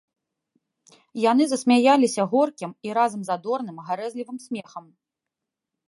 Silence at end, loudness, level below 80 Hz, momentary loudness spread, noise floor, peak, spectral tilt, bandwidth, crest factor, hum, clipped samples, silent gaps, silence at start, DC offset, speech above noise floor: 1.1 s; -22 LUFS; -78 dBFS; 16 LU; -86 dBFS; -6 dBFS; -4.5 dB/octave; 11.5 kHz; 20 dB; none; under 0.1%; none; 1.15 s; under 0.1%; 63 dB